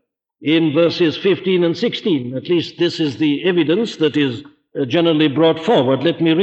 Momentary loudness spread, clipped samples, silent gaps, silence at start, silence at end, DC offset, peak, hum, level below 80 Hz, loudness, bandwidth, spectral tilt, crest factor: 6 LU; under 0.1%; none; 0.4 s; 0 s; under 0.1%; -4 dBFS; none; -64 dBFS; -17 LUFS; 8 kHz; -6.5 dB/octave; 14 dB